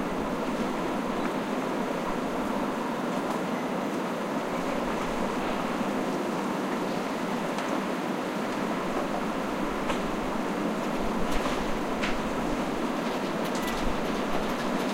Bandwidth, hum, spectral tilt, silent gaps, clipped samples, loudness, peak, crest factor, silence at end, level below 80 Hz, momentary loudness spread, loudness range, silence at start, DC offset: 16 kHz; none; -5 dB/octave; none; under 0.1%; -30 LUFS; -14 dBFS; 16 dB; 0 s; -44 dBFS; 1 LU; 1 LU; 0 s; under 0.1%